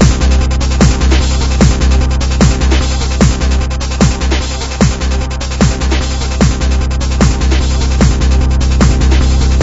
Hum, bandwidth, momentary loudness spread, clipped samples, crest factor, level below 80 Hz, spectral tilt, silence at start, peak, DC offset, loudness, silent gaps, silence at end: none; 8 kHz; 5 LU; 0.3%; 10 dB; -12 dBFS; -5.5 dB/octave; 0 s; 0 dBFS; under 0.1%; -12 LUFS; none; 0 s